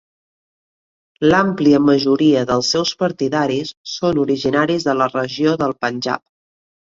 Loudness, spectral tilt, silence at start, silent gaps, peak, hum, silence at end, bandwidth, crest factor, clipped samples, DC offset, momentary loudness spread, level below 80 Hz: -17 LUFS; -5 dB/octave; 1.2 s; 3.77-3.84 s; -2 dBFS; none; 0.75 s; 7.8 kHz; 16 dB; under 0.1%; under 0.1%; 8 LU; -54 dBFS